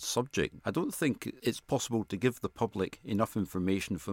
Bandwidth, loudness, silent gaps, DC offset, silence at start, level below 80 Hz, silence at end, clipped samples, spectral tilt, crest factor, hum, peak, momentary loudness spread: 17 kHz; -33 LUFS; none; under 0.1%; 0 s; -60 dBFS; 0 s; under 0.1%; -5 dB/octave; 18 dB; none; -14 dBFS; 3 LU